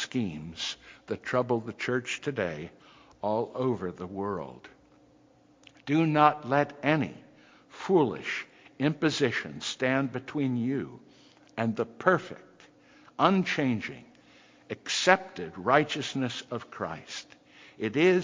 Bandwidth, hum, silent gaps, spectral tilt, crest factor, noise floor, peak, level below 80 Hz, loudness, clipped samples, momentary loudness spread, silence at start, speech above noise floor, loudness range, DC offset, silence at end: 7.6 kHz; none; none; -5 dB/octave; 26 dB; -61 dBFS; -4 dBFS; -64 dBFS; -29 LUFS; under 0.1%; 16 LU; 0 s; 32 dB; 5 LU; under 0.1%; 0 s